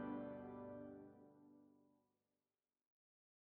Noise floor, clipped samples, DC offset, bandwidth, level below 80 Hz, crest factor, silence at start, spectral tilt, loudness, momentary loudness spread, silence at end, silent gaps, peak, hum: under -90 dBFS; under 0.1%; under 0.1%; 3.9 kHz; -82 dBFS; 18 dB; 0 s; -4.5 dB/octave; -54 LUFS; 18 LU; 1.55 s; none; -38 dBFS; none